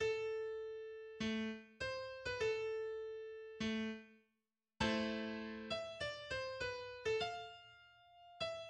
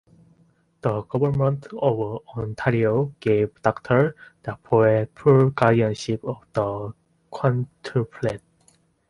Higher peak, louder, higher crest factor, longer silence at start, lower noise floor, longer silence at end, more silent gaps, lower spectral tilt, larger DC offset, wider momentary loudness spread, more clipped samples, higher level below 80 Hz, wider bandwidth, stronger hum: second, -24 dBFS vs -2 dBFS; second, -43 LUFS vs -23 LUFS; about the same, 20 dB vs 20 dB; second, 0 s vs 0.85 s; first, -89 dBFS vs -61 dBFS; second, 0 s vs 0.7 s; neither; second, -4.5 dB/octave vs -8 dB/octave; neither; about the same, 12 LU vs 13 LU; neither; second, -66 dBFS vs -54 dBFS; about the same, 10 kHz vs 11 kHz; neither